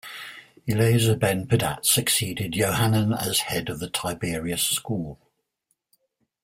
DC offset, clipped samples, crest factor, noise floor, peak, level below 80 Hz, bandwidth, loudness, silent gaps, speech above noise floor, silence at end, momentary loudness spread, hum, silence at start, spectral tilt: under 0.1%; under 0.1%; 18 dB; -75 dBFS; -6 dBFS; -52 dBFS; 16.5 kHz; -23 LUFS; none; 52 dB; 1.3 s; 11 LU; none; 0.05 s; -4 dB/octave